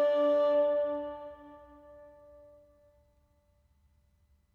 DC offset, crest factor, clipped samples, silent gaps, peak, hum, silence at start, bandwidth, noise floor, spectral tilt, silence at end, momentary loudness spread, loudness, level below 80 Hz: under 0.1%; 14 dB; under 0.1%; none; -20 dBFS; none; 0 s; 5.6 kHz; -69 dBFS; -6 dB/octave; 2.5 s; 21 LU; -29 LUFS; -68 dBFS